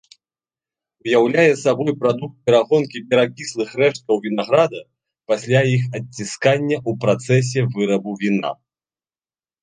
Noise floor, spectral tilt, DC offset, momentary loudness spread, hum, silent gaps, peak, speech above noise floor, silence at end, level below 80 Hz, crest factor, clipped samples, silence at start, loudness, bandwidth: under -90 dBFS; -6 dB/octave; under 0.1%; 10 LU; none; none; -2 dBFS; over 72 dB; 1.1 s; -62 dBFS; 18 dB; under 0.1%; 1.05 s; -19 LUFS; 9.8 kHz